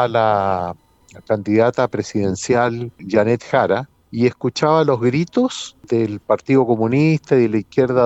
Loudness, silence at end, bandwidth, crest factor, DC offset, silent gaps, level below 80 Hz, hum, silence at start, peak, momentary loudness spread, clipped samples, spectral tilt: -18 LUFS; 0 s; 8.2 kHz; 16 dB; under 0.1%; none; -56 dBFS; none; 0 s; -2 dBFS; 7 LU; under 0.1%; -6.5 dB/octave